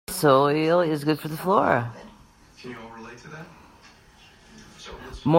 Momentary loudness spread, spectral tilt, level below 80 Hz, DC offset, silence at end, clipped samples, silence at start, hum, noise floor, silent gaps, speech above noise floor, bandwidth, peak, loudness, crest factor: 23 LU; -6 dB/octave; -54 dBFS; under 0.1%; 0 s; under 0.1%; 0.1 s; none; -53 dBFS; none; 30 dB; 16 kHz; -4 dBFS; -22 LUFS; 22 dB